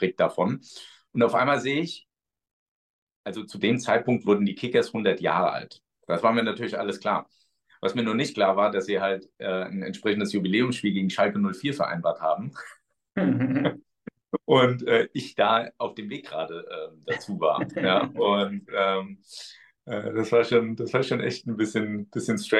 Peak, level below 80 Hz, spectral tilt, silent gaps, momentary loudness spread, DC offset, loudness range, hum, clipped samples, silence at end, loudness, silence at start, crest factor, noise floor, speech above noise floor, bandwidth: -6 dBFS; -70 dBFS; -5.5 dB/octave; 2.53-3.07 s, 3.16-3.24 s; 13 LU; under 0.1%; 2 LU; none; under 0.1%; 0 s; -25 LUFS; 0 s; 20 dB; -47 dBFS; 22 dB; 12 kHz